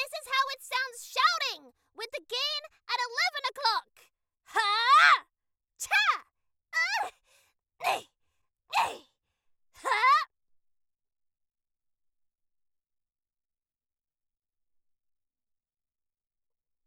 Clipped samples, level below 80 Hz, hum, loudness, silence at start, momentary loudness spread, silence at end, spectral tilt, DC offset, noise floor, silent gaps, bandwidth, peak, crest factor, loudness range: under 0.1%; -82 dBFS; none; -27 LUFS; 0 s; 17 LU; 6.6 s; 2 dB/octave; under 0.1%; under -90 dBFS; none; 17.5 kHz; -8 dBFS; 24 dB; 7 LU